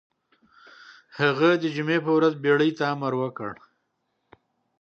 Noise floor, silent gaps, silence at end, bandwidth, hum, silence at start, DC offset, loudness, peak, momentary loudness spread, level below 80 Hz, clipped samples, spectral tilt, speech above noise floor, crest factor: -75 dBFS; none; 1.3 s; 7 kHz; none; 0.9 s; under 0.1%; -23 LUFS; -6 dBFS; 12 LU; -74 dBFS; under 0.1%; -7 dB/octave; 53 dB; 20 dB